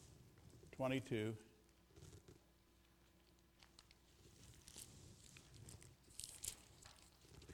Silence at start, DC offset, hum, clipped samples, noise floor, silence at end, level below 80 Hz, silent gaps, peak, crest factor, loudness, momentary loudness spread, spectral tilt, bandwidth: 0 s; under 0.1%; none; under 0.1%; -73 dBFS; 0 s; -72 dBFS; none; -28 dBFS; 26 dB; -50 LUFS; 24 LU; -4.5 dB/octave; 19.5 kHz